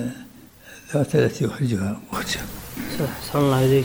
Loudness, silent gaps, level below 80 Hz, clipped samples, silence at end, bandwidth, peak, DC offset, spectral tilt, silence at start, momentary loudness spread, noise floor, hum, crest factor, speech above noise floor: -24 LUFS; none; -46 dBFS; under 0.1%; 0 s; over 20 kHz; -6 dBFS; under 0.1%; -6 dB/octave; 0 s; 14 LU; -45 dBFS; none; 16 dB; 24 dB